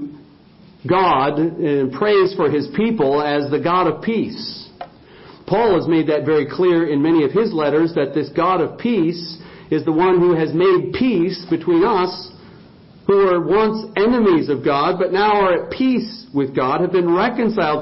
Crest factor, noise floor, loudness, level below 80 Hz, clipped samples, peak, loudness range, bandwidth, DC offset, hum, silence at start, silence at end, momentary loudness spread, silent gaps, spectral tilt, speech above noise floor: 14 dB; -46 dBFS; -17 LUFS; -52 dBFS; under 0.1%; -2 dBFS; 2 LU; 5.8 kHz; under 0.1%; none; 0 s; 0 s; 8 LU; none; -11 dB/octave; 30 dB